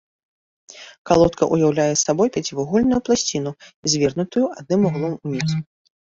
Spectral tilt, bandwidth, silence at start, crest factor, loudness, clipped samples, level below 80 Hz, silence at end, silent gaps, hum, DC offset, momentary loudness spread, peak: -5 dB/octave; 8 kHz; 0.7 s; 18 dB; -20 LUFS; under 0.1%; -48 dBFS; 0.4 s; 0.98-1.05 s, 3.74-3.83 s; none; under 0.1%; 10 LU; -2 dBFS